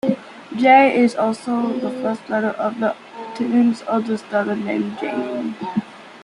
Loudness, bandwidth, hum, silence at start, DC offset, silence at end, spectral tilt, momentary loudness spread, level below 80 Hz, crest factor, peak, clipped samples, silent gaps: -19 LUFS; 11 kHz; none; 0.05 s; under 0.1%; 0 s; -6 dB/octave; 13 LU; -68 dBFS; 18 dB; -2 dBFS; under 0.1%; none